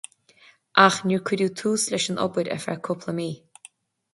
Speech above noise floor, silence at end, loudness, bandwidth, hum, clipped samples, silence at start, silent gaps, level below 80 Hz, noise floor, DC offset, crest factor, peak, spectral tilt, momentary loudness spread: 33 dB; 0.75 s; -23 LUFS; 12 kHz; none; under 0.1%; 0.75 s; none; -68 dBFS; -56 dBFS; under 0.1%; 24 dB; -2 dBFS; -4 dB/octave; 13 LU